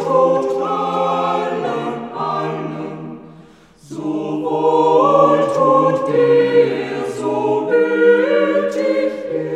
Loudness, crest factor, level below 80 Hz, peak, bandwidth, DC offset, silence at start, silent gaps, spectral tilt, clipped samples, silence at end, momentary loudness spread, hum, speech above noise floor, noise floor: -16 LUFS; 16 dB; -64 dBFS; 0 dBFS; 10 kHz; under 0.1%; 0 s; none; -6.5 dB/octave; under 0.1%; 0 s; 12 LU; none; 28 dB; -45 dBFS